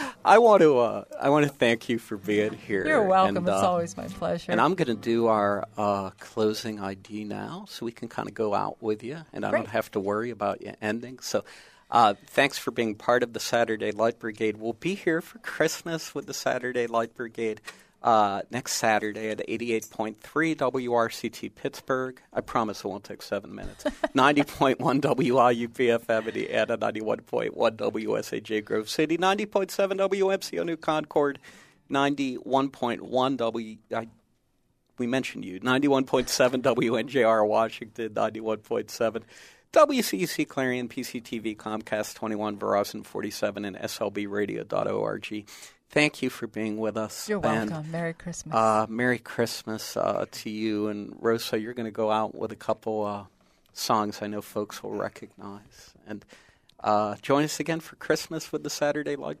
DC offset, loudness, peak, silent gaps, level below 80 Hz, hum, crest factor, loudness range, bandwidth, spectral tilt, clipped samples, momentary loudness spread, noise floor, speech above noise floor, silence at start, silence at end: under 0.1%; -27 LUFS; -4 dBFS; none; -60 dBFS; none; 24 dB; 6 LU; 15.5 kHz; -4.5 dB/octave; under 0.1%; 12 LU; -70 dBFS; 43 dB; 0 s; 0.05 s